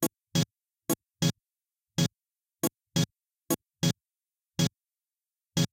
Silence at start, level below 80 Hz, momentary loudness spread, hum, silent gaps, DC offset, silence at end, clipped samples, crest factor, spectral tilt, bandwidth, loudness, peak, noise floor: 0 s; -62 dBFS; 5 LU; none; none; under 0.1%; 0.05 s; under 0.1%; 20 dB; -4.5 dB/octave; 17 kHz; -32 LUFS; -14 dBFS; under -90 dBFS